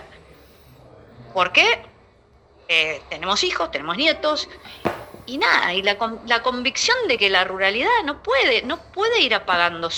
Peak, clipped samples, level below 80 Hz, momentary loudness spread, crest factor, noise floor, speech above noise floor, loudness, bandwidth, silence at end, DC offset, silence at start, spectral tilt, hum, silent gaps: -2 dBFS; under 0.1%; -52 dBFS; 11 LU; 20 dB; -54 dBFS; 33 dB; -19 LUFS; over 20 kHz; 0 s; under 0.1%; 0 s; -2 dB/octave; none; none